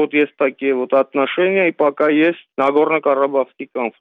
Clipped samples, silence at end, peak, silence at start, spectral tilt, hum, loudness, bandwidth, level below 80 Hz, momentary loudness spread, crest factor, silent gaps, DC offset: under 0.1%; 0.1 s; -4 dBFS; 0 s; -7.5 dB/octave; none; -17 LUFS; 4.7 kHz; -72 dBFS; 6 LU; 12 dB; none; under 0.1%